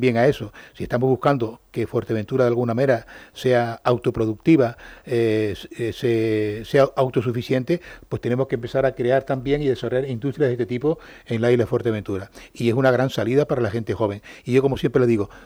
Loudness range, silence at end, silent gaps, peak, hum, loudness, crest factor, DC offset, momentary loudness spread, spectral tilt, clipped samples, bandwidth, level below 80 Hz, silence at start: 2 LU; 0.05 s; none; -6 dBFS; none; -22 LUFS; 16 dB; under 0.1%; 10 LU; -7.5 dB/octave; under 0.1%; over 20 kHz; -50 dBFS; 0 s